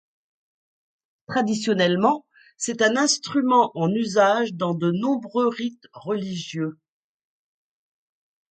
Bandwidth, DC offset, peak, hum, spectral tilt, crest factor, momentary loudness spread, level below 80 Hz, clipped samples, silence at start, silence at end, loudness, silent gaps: 9.6 kHz; under 0.1%; -4 dBFS; none; -4.5 dB/octave; 20 dB; 11 LU; -70 dBFS; under 0.1%; 1.3 s; 1.8 s; -22 LUFS; none